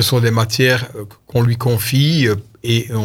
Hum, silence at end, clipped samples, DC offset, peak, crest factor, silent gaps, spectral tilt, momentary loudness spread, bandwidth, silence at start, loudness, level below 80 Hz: none; 0 s; under 0.1%; under 0.1%; 0 dBFS; 14 dB; none; -5 dB/octave; 8 LU; 17 kHz; 0 s; -16 LUFS; -48 dBFS